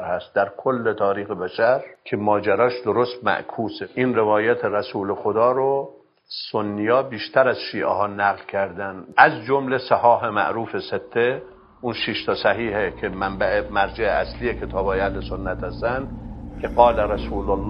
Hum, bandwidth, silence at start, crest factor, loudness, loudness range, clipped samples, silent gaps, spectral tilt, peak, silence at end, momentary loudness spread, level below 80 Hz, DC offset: none; 5.4 kHz; 0 s; 22 dB; -22 LUFS; 4 LU; under 0.1%; none; -8.5 dB/octave; 0 dBFS; 0 s; 11 LU; -40 dBFS; under 0.1%